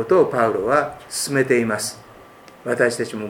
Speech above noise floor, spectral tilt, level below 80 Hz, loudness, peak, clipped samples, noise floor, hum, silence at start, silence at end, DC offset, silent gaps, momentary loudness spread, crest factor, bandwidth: 25 dB; -4 dB/octave; -58 dBFS; -20 LUFS; -2 dBFS; under 0.1%; -45 dBFS; none; 0 s; 0 s; under 0.1%; none; 10 LU; 18 dB; 17.5 kHz